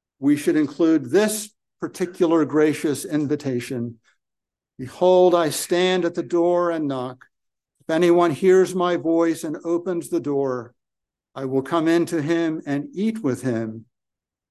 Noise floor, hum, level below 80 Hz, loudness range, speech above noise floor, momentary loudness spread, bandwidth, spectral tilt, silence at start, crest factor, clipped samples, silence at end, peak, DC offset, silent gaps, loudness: -86 dBFS; none; -68 dBFS; 3 LU; 65 dB; 14 LU; 12.5 kHz; -5.5 dB/octave; 0.2 s; 16 dB; under 0.1%; 0.7 s; -6 dBFS; under 0.1%; none; -21 LUFS